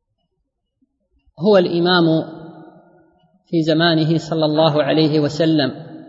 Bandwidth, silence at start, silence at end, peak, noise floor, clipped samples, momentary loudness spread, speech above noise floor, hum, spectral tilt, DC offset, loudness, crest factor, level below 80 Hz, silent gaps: 7.8 kHz; 1.4 s; 0.05 s; 0 dBFS; -73 dBFS; under 0.1%; 8 LU; 57 dB; none; -7 dB/octave; under 0.1%; -16 LUFS; 18 dB; -62 dBFS; none